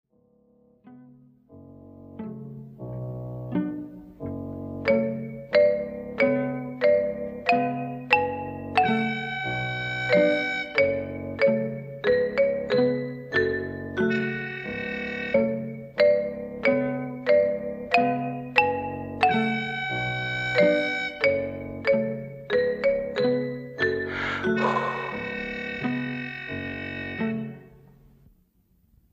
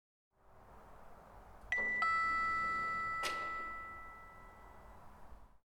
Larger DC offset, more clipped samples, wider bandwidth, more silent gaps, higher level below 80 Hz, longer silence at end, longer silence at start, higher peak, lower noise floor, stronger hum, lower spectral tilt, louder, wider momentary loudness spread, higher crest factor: neither; neither; second, 8.6 kHz vs 18 kHz; neither; first, -56 dBFS vs -62 dBFS; first, 1.45 s vs 0.25 s; first, 0.85 s vs 0.5 s; first, -4 dBFS vs -24 dBFS; first, -64 dBFS vs -60 dBFS; neither; first, -7 dB/octave vs -2.5 dB/octave; first, -26 LUFS vs -36 LUFS; second, 12 LU vs 26 LU; about the same, 22 dB vs 18 dB